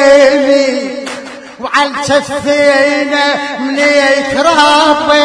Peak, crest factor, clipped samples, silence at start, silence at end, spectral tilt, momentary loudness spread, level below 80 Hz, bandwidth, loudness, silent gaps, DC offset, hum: 0 dBFS; 10 dB; 0.4%; 0 s; 0 s; -2.5 dB/octave; 13 LU; -46 dBFS; 10.5 kHz; -10 LUFS; none; under 0.1%; none